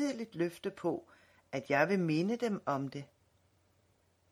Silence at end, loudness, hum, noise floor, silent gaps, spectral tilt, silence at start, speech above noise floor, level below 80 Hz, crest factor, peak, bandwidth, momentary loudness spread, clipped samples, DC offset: 1.25 s; -35 LUFS; none; -72 dBFS; none; -6.5 dB/octave; 0 s; 38 dB; -78 dBFS; 22 dB; -14 dBFS; 14.5 kHz; 13 LU; under 0.1%; under 0.1%